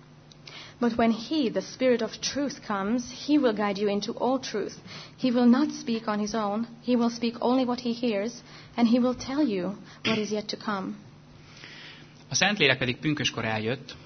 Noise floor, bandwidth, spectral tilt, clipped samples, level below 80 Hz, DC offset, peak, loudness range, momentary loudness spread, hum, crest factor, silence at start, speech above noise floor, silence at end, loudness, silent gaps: -50 dBFS; 6.6 kHz; -4.5 dB/octave; under 0.1%; -62 dBFS; under 0.1%; -4 dBFS; 2 LU; 15 LU; none; 22 dB; 0.45 s; 23 dB; 0 s; -27 LUFS; none